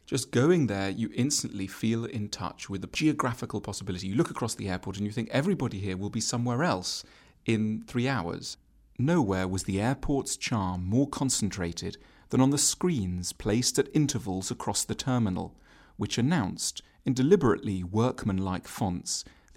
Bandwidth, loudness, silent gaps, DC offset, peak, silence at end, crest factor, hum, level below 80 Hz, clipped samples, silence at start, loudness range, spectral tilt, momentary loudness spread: 16 kHz; -29 LUFS; none; under 0.1%; -8 dBFS; 0.25 s; 20 dB; none; -52 dBFS; under 0.1%; 0.1 s; 3 LU; -5 dB/octave; 11 LU